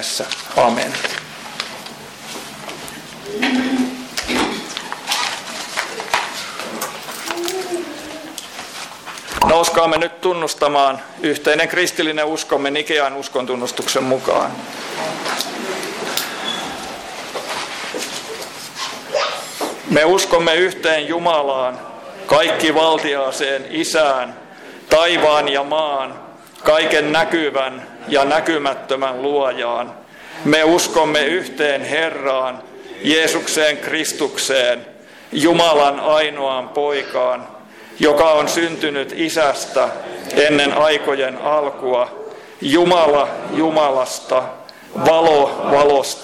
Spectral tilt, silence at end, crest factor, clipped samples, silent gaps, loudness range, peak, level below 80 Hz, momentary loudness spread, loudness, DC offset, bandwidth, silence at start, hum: -3 dB/octave; 0 s; 16 dB; under 0.1%; none; 7 LU; -2 dBFS; -52 dBFS; 16 LU; -17 LUFS; under 0.1%; 16.5 kHz; 0 s; none